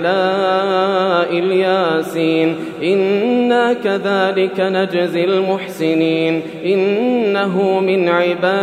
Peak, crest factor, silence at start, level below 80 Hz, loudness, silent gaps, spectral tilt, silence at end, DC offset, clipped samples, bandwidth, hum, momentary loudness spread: -2 dBFS; 14 dB; 0 s; -70 dBFS; -16 LUFS; none; -6.5 dB/octave; 0 s; under 0.1%; under 0.1%; 14.5 kHz; none; 3 LU